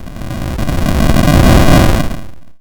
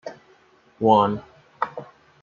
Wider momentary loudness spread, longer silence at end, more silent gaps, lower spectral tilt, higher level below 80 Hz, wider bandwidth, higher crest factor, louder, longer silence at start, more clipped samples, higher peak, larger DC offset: second, 15 LU vs 21 LU; second, 0.05 s vs 0.4 s; neither; second, -6 dB/octave vs -7.5 dB/octave; first, -16 dBFS vs -64 dBFS; first, 19.5 kHz vs 7 kHz; second, 10 dB vs 22 dB; first, -11 LUFS vs -22 LUFS; about the same, 0 s vs 0.05 s; neither; first, 0 dBFS vs -4 dBFS; neither